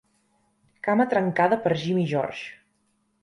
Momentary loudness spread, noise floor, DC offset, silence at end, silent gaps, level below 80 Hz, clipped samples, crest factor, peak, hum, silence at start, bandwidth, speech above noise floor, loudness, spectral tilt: 11 LU; -70 dBFS; under 0.1%; 0.7 s; none; -68 dBFS; under 0.1%; 18 dB; -8 dBFS; none; 0.85 s; 11.5 kHz; 47 dB; -24 LUFS; -7 dB/octave